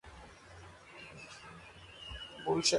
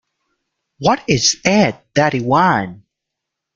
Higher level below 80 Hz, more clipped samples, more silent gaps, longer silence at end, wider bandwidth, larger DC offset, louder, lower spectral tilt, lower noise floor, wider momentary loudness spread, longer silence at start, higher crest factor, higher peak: second, -60 dBFS vs -50 dBFS; neither; neither; second, 0 s vs 0.8 s; first, 11.5 kHz vs 9.2 kHz; neither; second, -41 LUFS vs -15 LUFS; second, -2.5 dB/octave vs -4 dB/octave; second, -54 dBFS vs -80 dBFS; first, 17 LU vs 6 LU; second, 0.05 s vs 0.8 s; first, 22 dB vs 16 dB; second, -16 dBFS vs -2 dBFS